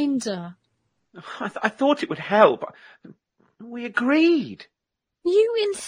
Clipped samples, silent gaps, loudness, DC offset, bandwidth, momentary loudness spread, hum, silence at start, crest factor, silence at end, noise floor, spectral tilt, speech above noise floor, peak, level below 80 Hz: under 0.1%; none; -21 LUFS; under 0.1%; 11 kHz; 20 LU; none; 0 s; 20 dB; 0 s; -82 dBFS; -4.5 dB/octave; 60 dB; -2 dBFS; -74 dBFS